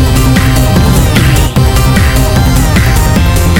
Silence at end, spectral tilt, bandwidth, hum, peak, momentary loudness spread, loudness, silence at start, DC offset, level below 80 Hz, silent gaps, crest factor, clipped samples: 0 s; -5.5 dB/octave; 17.5 kHz; none; 0 dBFS; 1 LU; -8 LUFS; 0 s; under 0.1%; -12 dBFS; none; 6 dB; 0.2%